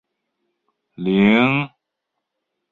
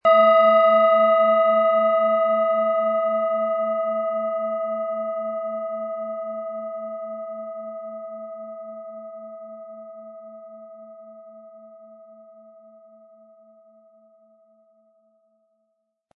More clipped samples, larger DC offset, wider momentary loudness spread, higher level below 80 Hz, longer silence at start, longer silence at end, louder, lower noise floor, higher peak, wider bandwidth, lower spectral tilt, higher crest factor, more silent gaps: neither; neither; second, 14 LU vs 25 LU; first, -56 dBFS vs -82 dBFS; first, 1 s vs 0.05 s; second, 1.05 s vs 4 s; first, -17 LUFS vs -21 LUFS; first, -79 dBFS vs -74 dBFS; first, -2 dBFS vs -6 dBFS; second, 4.2 kHz vs 5 kHz; about the same, -8 dB/octave vs -7.5 dB/octave; about the same, 20 dB vs 18 dB; neither